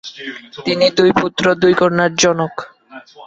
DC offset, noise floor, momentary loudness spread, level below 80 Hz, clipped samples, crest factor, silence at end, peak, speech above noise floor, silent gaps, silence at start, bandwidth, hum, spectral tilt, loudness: under 0.1%; -39 dBFS; 17 LU; -52 dBFS; under 0.1%; 16 dB; 0 s; 0 dBFS; 24 dB; none; 0.05 s; 8 kHz; none; -4 dB/octave; -14 LUFS